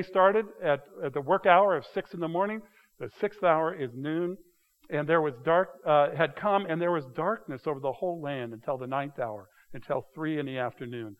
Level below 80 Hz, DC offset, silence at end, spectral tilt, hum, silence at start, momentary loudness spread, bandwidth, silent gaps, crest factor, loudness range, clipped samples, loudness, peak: -70 dBFS; under 0.1%; 0.05 s; -7.5 dB/octave; none; 0 s; 12 LU; 12.5 kHz; none; 24 dB; 6 LU; under 0.1%; -29 LUFS; -6 dBFS